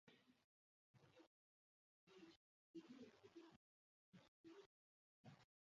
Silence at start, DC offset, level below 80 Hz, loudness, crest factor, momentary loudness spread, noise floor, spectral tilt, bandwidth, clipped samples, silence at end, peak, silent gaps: 0.05 s; under 0.1%; under -90 dBFS; -66 LUFS; 22 dB; 6 LU; under -90 dBFS; -5 dB/octave; 7.2 kHz; under 0.1%; 0.25 s; -48 dBFS; 0.44-0.94 s, 1.27-2.07 s, 2.36-2.74 s, 3.56-4.12 s, 4.28-4.44 s, 4.66-5.24 s